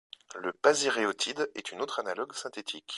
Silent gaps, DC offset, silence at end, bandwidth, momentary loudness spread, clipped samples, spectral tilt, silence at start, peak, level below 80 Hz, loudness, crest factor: none; under 0.1%; 0 s; 11.5 kHz; 12 LU; under 0.1%; -1.5 dB/octave; 0.3 s; -8 dBFS; -78 dBFS; -31 LUFS; 24 dB